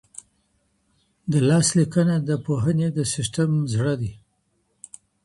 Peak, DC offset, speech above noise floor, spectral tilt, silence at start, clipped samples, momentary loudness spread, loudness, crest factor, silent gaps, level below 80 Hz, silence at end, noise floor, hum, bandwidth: -6 dBFS; under 0.1%; 48 dB; -5.5 dB/octave; 1.25 s; under 0.1%; 24 LU; -22 LUFS; 16 dB; none; -54 dBFS; 1.1 s; -69 dBFS; none; 11.5 kHz